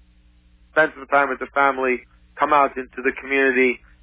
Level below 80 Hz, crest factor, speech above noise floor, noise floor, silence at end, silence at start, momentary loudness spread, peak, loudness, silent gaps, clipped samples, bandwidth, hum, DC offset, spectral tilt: -54 dBFS; 18 dB; 34 dB; -54 dBFS; 0.25 s; 0.75 s; 7 LU; -4 dBFS; -20 LUFS; none; under 0.1%; 4 kHz; 60 Hz at -55 dBFS; under 0.1%; -7.5 dB/octave